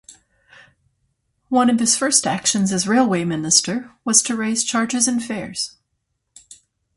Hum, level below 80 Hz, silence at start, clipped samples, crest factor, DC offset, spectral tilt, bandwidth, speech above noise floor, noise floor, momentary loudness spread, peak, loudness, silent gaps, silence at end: none; -60 dBFS; 0.1 s; under 0.1%; 20 dB; under 0.1%; -2.5 dB/octave; 11.5 kHz; 55 dB; -73 dBFS; 11 LU; 0 dBFS; -18 LUFS; none; 0.4 s